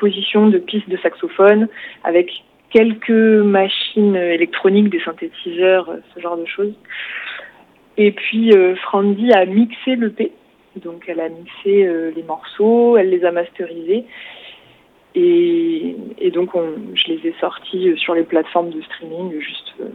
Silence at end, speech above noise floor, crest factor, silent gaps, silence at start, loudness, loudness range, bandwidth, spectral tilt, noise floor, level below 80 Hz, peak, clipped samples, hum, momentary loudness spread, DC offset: 0 s; 34 dB; 16 dB; none; 0 s; -16 LUFS; 5 LU; 4.6 kHz; -8 dB/octave; -50 dBFS; -66 dBFS; 0 dBFS; under 0.1%; none; 16 LU; under 0.1%